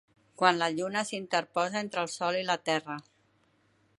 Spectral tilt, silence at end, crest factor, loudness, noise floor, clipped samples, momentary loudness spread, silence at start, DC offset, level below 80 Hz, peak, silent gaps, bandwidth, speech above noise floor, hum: -3.5 dB/octave; 0.95 s; 26 dB; -30 LUFS; -69 dBFS; under 0.1%; 7 LU; 0.4 s; under 0.1%; -80 dBFS; -6 dBFS; none; 11.5 kHz; 39 dB; none